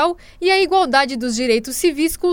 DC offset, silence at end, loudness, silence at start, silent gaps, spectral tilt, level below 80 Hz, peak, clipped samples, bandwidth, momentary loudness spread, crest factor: under 0.1%; 0 s; -17 LUFS; 0 s; none; -2.5 dB/octave; -44 dBFS; -2 dBFS; under 0.1%; over 20 kHz; 6 LU; 16 dB